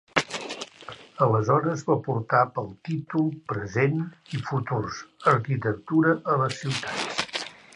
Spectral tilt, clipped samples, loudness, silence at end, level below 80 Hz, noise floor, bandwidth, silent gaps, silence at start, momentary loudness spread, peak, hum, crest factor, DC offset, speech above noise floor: -6 dB/octave; under 0.1%; -26 LUFS; 0.2 s; -60 dBFS; -45 dBFS; 11 kHz; none; 0.15 s; 11 LU; -2 dBFS; none; 24 dB; under 0.1%; 20 dB